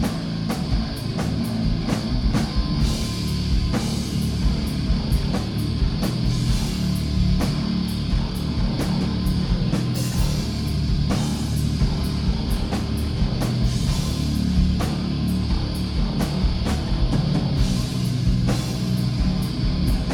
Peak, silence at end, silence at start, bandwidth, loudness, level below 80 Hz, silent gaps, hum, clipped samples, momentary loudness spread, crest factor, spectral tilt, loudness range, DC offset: -8 dBFS; 0 s; 0 s; 18.5 kHz; -23 LUFS; -26 dBFS; none; none; under 0.1%; 3 LU; 14 dB; -6 dB/octave; 1 LU; under 0.1%